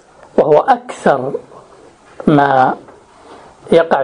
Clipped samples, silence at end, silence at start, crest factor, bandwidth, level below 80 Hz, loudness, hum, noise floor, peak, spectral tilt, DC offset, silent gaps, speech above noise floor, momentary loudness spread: under 0.1%; 0 s; 0.35 s; 14 dB; 10 kHz; -50 dBFS; -13 LUFS; none; -42 dBFS; 0 dBFS; -7 dB/octave; under 0.1%; none; 30 dB; 11 LU